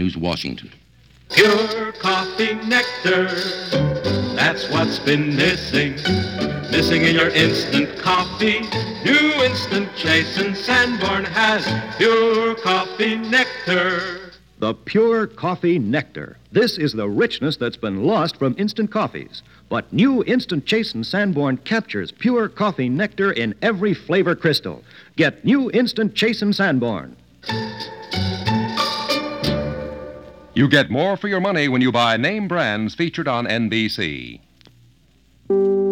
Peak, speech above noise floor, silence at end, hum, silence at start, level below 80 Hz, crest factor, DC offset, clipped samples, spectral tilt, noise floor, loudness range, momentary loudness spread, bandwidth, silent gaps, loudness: 0 dBFS; 36 dB; 0 s; none; 0 s; -48 dBFS; 20 dB; under 0.1%; under 0.1%; -5.5 dB/octave; -56 dBFS; 4 LU; 10 LU; 16.5 kHz; none; -19 LUFS